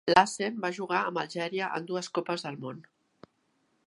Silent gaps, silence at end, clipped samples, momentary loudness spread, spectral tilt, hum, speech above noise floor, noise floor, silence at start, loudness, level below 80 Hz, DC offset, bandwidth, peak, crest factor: none; 1.05 s; under 0.1%; 14 LU; -4 dB/octave; none; 44 dB; -73 dBFS; 0.05 s; -30 LUFS; -70 dBFS; under 0.1%; 11.5 kHz; -4 dBFS; 26 dB